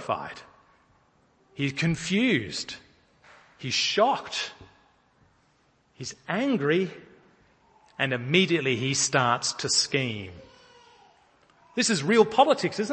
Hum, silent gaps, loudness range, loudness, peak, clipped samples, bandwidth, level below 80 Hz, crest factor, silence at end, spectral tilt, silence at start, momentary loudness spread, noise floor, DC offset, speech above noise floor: none; none; 6 LU; -25 LUFS; -6 dBFS; under 0.1%; 8.8 kHz; -64 dBFS; 22 dB; 0 s; -3.5 dB/octave; 0 s; 17 LU; -65 dBFS; under 0.1%; 40 dB